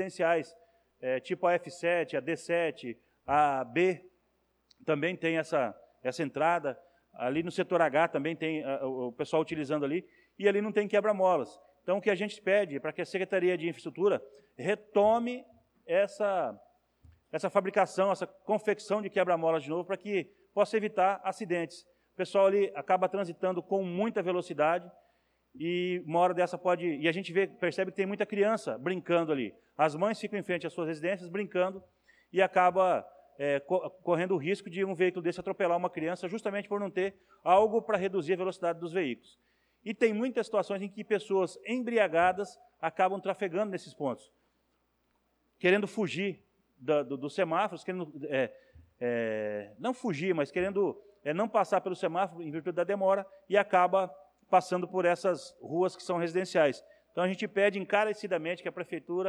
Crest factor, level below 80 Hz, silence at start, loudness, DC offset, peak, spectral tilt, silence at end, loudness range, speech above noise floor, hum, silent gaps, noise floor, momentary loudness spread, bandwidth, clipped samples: 18 dB; -74 dBFS; 0 s; -31 LUFS; under 0.1%; -12 dBFS; -6 dB/octave; 0 s; 3 LU; 45 dB; none; none; -75 dBFS; 10 LU; 11.5 kHz; under 0.1%